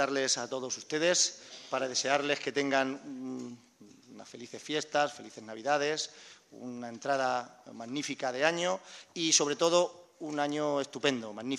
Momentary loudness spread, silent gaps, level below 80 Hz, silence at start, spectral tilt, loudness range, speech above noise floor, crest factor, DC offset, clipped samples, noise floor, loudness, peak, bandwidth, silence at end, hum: 19 LU; none; -82 dBFS; 0 s; -2 dB/octave; 5 LU; 22 dB; 24 dB; under 0.1%; under 0.1%; -55 dBFS; -31 LUFS; -10 dBFS; 12 kHz; 0 s; none